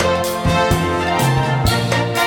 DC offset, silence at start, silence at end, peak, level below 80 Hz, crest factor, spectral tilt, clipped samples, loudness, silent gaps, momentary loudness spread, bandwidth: under 0.1%; 0 s; 0 s; -2 dBFS; -32 dBFS; 14 dB; -5 dB/octave; under 0.1%; -17 LUFS; none; 2 LU; 19 kHz